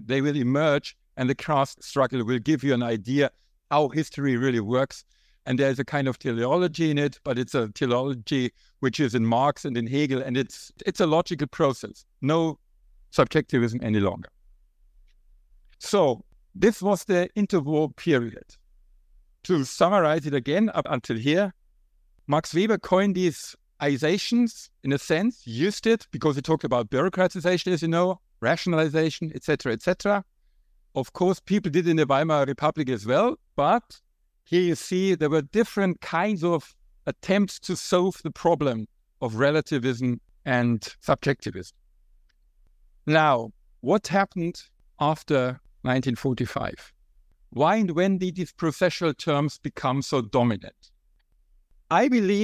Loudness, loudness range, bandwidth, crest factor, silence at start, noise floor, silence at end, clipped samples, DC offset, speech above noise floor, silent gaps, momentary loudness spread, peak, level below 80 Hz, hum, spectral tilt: -25 LUFS; 2 LU; 15.5 kHz; 20 dB; 0 s; -64 dBFS; 0 s; under 0.1%; under 0.1%; 40 dB; none; 9 LU; -4 dBFS; -56 dBFS; none; -6 dB/octave